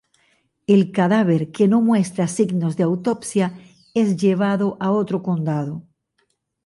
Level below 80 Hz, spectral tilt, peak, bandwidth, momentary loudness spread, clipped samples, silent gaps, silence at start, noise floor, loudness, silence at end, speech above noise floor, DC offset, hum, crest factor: -64 dBFS; -7 dB/octave; -6 dBFS; 11.5 kHz; 8 LU; under 0.1%; none; 0.7 s; -69 dBFS; -20 LUFS; 0.85 s; 50 dB; under 0.1%; none; 14 dB